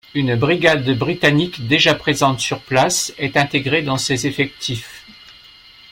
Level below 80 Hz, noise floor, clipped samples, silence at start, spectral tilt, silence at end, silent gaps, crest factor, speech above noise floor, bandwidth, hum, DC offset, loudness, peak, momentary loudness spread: -50 dBFS; -44 dBFS; under 0.1%; 0.15 s; -4 dB/octave; 0.6 s; none; 16 dB; 27 dB; 16.5 kHz; none; under 0.1%; -17 LUFS; -2 dBFS; 7 LU